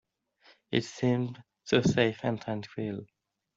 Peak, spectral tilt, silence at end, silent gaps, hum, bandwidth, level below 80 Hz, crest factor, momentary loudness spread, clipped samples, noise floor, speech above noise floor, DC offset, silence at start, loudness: -10 dBFS; -6 dB/octave; 0.5 s; none; none; 7.8 kHz; -62 dBFS; 22 dB; 12 LU; under 0.1%; -63 dBFS; 34 dB; under 0.1%; 0.7 s; -30 LUFS